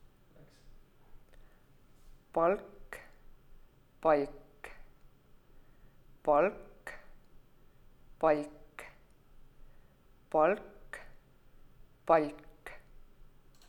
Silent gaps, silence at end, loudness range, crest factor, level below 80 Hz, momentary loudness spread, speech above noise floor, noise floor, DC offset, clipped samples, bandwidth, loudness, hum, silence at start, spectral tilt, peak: none; 0.9 s; 4 LU; 24 dB; -58 dBFS; 23 LU; 32 dB; -61 dBFS; under 0.1%; under 0.1%; 18.5 kHz; -31 LUFS; none; 1.15 s; -6.5 dB/octave; -12 dBFS